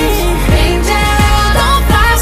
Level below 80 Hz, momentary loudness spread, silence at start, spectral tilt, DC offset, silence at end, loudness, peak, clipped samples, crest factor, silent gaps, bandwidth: -14 dBFS; 3 LU; 0 s; -4.5 dB/octave; under 0.1%; 0 s; -11 LUFS; 0 dBFS; under 0.1%; 10 dB; none; 15.5 kHz